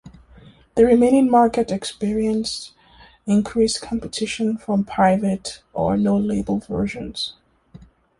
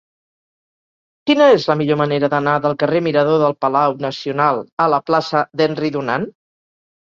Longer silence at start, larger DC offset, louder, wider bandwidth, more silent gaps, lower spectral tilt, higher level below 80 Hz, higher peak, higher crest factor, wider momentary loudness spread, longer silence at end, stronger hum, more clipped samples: second, 0.05 s vs 1.25 s; neither; second, -20 LUFS vs -16 LUFS; first, 11.5 kHz vs 7.4 kHz; second, none vs 4.72-4.77 s; about the same, -5.5 dB/octave vs -6.5 dB/octave; first, -46 dBFS vs -60 dBFS; about the same, -4 dBFS vs -2 dBFS; about the same, 18 dB vs 16 dB; first, 13 LU vs 9 LU; second, 0.4 s vs 0.8 s; neither; neither